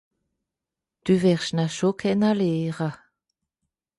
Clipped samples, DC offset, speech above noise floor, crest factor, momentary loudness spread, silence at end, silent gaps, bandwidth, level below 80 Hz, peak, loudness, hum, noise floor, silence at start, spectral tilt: under 0.1%; under 0.1%; 65 dB; 16 dB; 10 LU; 1.05 s; none; 11.5 kHz; -62 dBFS; -8 dBFS; -23 LUFS; none; -87 dBFS; 1.05 s; -6.5 dB/octave